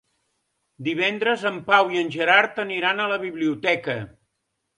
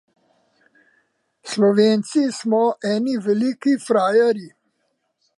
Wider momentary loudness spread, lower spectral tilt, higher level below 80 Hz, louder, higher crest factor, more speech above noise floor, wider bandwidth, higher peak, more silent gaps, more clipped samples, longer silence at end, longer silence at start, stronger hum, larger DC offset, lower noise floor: first, 11 LU vs 6 LU; about the same, -5 dB/octave vs -5.5 dB/octave; first, -68 dBFS vs -74 dBFS; second, -22 LUFS vs -19 LUFS; first, 22 dB vs 16 dB; about the same, 55 dB vs 53 dB; about the same, 11 kHz vs 11.5 kHz; about the same, -2 dBFS vs -4 dBFS; neither; neither; second, 0.7 s vs 0.9 s; second, 0.8 s vs 1.45 s; neither; neither; first, -77 dBFS vs -71 dBFS